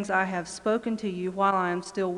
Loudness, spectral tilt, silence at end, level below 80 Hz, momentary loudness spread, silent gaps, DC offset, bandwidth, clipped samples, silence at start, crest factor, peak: -28 LUFS; -5.5 dB/octave; 0 s; -64 dBFS; 6 LU; none; under 0.1%; 11.5 kHz; under 0.1%; 0 s; 16 dB; -10 dBFS